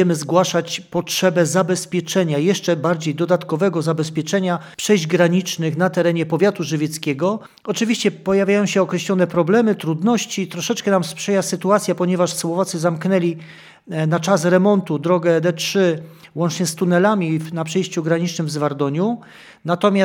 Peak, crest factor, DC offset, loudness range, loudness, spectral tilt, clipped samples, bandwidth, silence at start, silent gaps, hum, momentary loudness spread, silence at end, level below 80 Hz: 0 dBFS; 18 dB; under 0.1%; 2 LU; -19 LUFS; -5.5 dB/octave; under 0.1%; 17 kHz; 0 s; none; none; 7 LU; 0 s; -66 dBFS